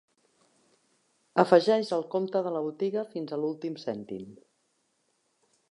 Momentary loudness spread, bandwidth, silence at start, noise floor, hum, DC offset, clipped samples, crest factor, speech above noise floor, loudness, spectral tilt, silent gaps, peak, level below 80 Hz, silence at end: 16 LU; 11 kHz; 1.35 s; -74 dBFS; none; under 0.1%; under 0.1%; 24 dB; 46 dB; -28 LUFS; -6.5 dB/octave; none; -6 dBFS; -80 dBFS; 1.35 s